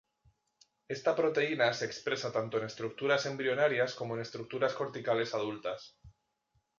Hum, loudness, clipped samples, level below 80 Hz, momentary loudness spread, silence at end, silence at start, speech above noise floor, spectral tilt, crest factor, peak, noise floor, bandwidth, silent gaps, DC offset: none; -33 LUFS; under 0.1%; -72 dBFS; 10 LU; 0.7 s; 0.9 s; 45 dB; -4.5 dB/octave; 18 dB; -16 dBFS; -78 dBFS; 7.4 kHz; none; under 0.1%